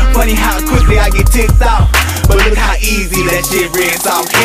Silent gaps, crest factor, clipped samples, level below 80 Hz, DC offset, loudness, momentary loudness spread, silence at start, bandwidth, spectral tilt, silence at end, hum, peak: none; 10 dB; under 0.1%; -12 dBFS; under 0.1%; -11 LUFS; 3 LU; 0 s; 16 kHz; -4 dB/octave; 0 s; none; 0 dBFS